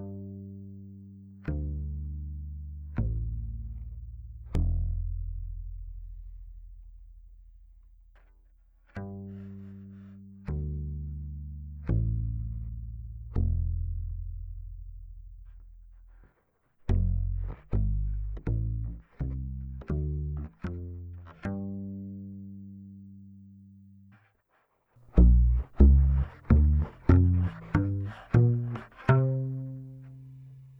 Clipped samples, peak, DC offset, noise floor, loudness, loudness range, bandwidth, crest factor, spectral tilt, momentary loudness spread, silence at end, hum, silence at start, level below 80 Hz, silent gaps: under 0.1%; -6 dBFS; under 0.1%; -72 dBFS; -30 LUFS; 20 LU; 3.5 kHz; 24 dB; -10.5 dB/octave; 23 LU; 0 s; none; 0 s; -32 dBFS; none